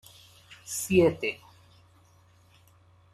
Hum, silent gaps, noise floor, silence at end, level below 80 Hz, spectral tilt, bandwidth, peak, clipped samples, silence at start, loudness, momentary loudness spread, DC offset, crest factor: none; none; -60 dBFS; 1.8 s; -62 dBFS; -5 dB/octave; 14.5 kHz; -10 dBFS; under 0.1%; 0.5 s; -26 LUFS; 22 LU; under 0.1%; 22 dB